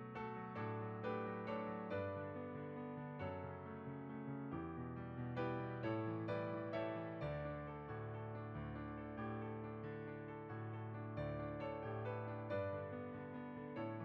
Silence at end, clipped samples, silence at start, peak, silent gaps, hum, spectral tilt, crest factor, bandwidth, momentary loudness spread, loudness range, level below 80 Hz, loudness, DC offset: 0 s; under 0.1%; 0 s; -30 dBFS; none; none; -7 dB/octave; 16 dB; 5.8 kHz; 6 LU; 4 LU; -66 dBFS; -47 LUFS; under 0.1%